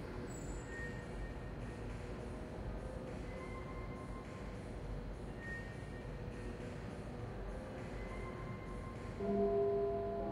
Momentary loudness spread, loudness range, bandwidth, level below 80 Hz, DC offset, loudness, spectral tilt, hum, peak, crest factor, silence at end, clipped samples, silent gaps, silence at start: 11 LU; 6 LU; 12 kHz; -50 dBFS; under 0.1%; -44 LUFS; -7 dB/octave; none; -24 dBFS; 18 dB; 0 s; under 0.1%; none; 0 s